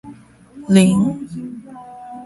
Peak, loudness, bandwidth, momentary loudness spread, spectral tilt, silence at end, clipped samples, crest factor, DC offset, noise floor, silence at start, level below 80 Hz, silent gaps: 0 dBFS; -15 LUFS; 11.5 kHz; 24 LU; -6.5 dB/octave; 0 s; under 0.1%; 18 dB; under 0.1%; -42 dBFS; 0.05 s; -52 dBFS; none